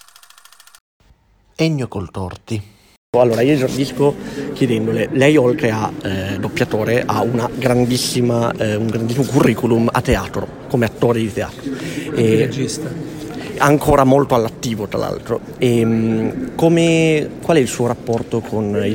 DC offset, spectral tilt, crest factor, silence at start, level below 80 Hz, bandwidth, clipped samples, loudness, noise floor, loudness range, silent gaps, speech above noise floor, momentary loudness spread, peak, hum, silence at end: under 0.1%; -6 dB/octave; 16 dB; 1.6 s; -40 dBFS; 17 kHz; under 0.1%; -17 LUFS; -53 dBFS; 3 LU; 2.97-3.13 s; 37 dB; 12 LU; 0 dBFS; none; 0 s